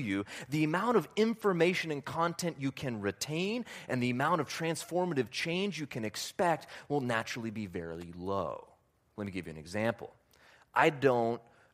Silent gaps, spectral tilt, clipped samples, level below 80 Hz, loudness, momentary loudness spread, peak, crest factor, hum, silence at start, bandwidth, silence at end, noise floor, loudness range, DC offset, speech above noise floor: none; -5 dB/octave; under 0.1%; -68 dBFS; -33 LUFS; 12 LU; -10 dBFS; 22 dB; none; 0 s; 15.5 kHz; 0.35 s; -66 dBFS; 6 LU; under 0.1%; 33 dB